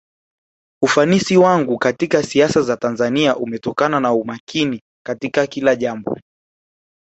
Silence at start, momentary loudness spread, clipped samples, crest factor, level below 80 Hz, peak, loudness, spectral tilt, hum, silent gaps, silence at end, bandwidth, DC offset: 0.8 s; 11 LU; under 0.1%; 16 dB; -56 dBFS; -2 dBFS; -17 LUFS; -5 dB/octave; none; 4.40-4.47 s, 4.81-5.05 s; 0.9 s; 8.2 kHz; under 0.1%